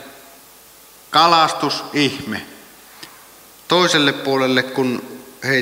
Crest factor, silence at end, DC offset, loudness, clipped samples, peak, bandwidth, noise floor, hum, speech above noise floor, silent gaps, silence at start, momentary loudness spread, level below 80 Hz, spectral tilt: 20 dB; 0 s; under 0.1%; -17 LUFS; under 0.1%; 0 dBFS; 16 kHz; -45 dBFS; none; 28 dB; none; 0 s; 25 LU; -64 dBFS; -3.5 dB/octave